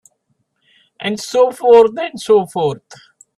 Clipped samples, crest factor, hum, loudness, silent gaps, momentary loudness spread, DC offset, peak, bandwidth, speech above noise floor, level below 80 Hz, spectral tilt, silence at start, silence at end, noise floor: under 0.1%; 16 dB; none; -14 LUFS; none; 14 LU; under 0.1%; 0 dBFS; 12.5 kHz; 53 dB; -60 dBFS; -4.5 dB/octave; 1 s; 0.45 s; -66 dBFS